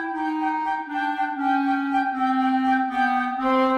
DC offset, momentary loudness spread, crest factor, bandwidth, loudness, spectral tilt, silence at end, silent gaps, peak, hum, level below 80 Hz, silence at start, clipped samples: under 0.1%; 5 LU; 12 dB; 8.4 kHz; -23 LUFS; -4.5 dB/octave; 0 s; none; -10 dBFS; none; -62 dBFS; 0 s; under 0.1%